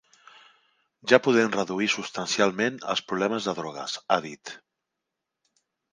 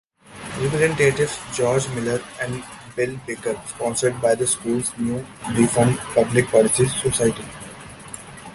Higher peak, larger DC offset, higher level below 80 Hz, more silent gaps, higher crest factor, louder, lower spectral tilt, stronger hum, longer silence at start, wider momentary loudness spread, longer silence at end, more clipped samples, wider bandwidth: about the same, -4 dBFS vs -2 dBFS; neither; second, -72 dBFS vs -50 dBFS; neither; first, 24 dB vs 18 dB; second, -25 LUFS vs -21 LUFS; about the same, -3.5 dB/octave vs -4.5 dB/octave; neither; first, 1.05 s vs 0.3 s; about the same, 16 LU vs 18 LU; first, 1.35 s vs 0 s; neither; second, 10 kHz vs 12 kHz